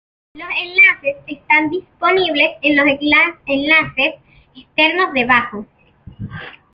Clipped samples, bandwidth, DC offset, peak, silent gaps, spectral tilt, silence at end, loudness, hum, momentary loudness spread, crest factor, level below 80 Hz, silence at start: under 0.1%; 5.8 kHz; under 0.1%; -2 dBFS; none; -6.5 dB/octave; 0.2 s; -14 LUFS; none; 20 LU; 16 dB; -52 dBFS; 0.35 s